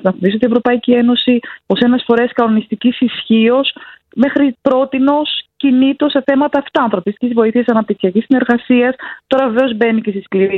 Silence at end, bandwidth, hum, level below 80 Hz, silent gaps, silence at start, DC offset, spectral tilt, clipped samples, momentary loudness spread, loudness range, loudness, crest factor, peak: 0 s; 4.4 kHz; none; -56 dBFS; none; 0.05 s; under 0.1%; -8 dB/octave; under 0.1%; 5 LU; 1 LU; -13 LUFS; 12 dB; 0 dBFS